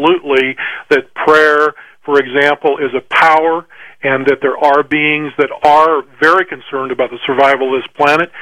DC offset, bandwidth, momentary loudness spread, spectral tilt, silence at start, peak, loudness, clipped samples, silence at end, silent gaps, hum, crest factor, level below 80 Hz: 0.4%; 12 kHz; 8 LU; -5 dB/octave; 0 s; 0 dBFS; -12 LUFS; 0.3%; 0 s; none; none; 12 dB; -56 dBFS